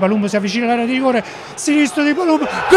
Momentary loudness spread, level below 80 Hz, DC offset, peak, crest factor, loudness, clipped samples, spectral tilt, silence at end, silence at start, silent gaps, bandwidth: 5 LU; -54 dBFS; under 0.1%; 0 dBFS; 14 dB; -16 LUFS; under 0.1%; -4.5 dB/octave; 0 s; 0 s; none; 13 kHz